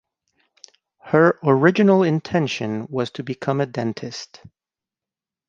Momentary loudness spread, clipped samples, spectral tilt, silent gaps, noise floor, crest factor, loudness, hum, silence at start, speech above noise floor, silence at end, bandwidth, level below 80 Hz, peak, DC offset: 14 LU; under 0.1%; -7 dB/octave; none; -89 dBFS; 20 dB; -20 LUFS; none; 1.05 s; 70 dB; 1.25 s; 7.6 kHz; -62 dBFS; -2 dBFS; under 0.1%